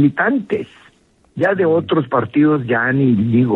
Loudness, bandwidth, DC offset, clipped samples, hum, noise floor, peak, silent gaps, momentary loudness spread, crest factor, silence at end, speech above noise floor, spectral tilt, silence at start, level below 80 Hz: -16 LUFS; 4.1 kHz; under 0.1%; under 0.1%; none; -53 dBFS; -2 dBFS; none; 9 LU; 14 dB; 0 s; 38 dB; -9.5 dB/octave; 0 s; -58 dBFS